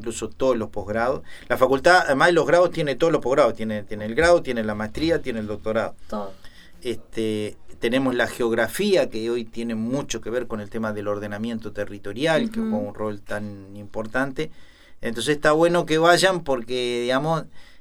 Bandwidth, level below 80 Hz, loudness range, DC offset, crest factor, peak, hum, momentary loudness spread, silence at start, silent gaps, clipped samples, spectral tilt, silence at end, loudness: 16.5 kHz; -46 dBFS; 8 LU; under 0.1%; 22 dB; -2 dBFS; none; 14 LU; 0 s; none; under 0.1%; -4.5 dB/octave; 0 s; -23 LUFS